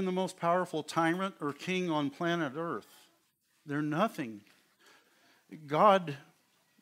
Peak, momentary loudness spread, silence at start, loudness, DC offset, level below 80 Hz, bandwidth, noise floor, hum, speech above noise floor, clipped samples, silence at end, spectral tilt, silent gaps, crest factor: -10 dBFS; 17 LU; 0 s; -32 LUFS; under 0.1%; -84 dBFS; 16 kHz; -73 dBFS; none; 42 dB; under 0.1%; 0.6 s; -6 dB/octave; none; 22 dB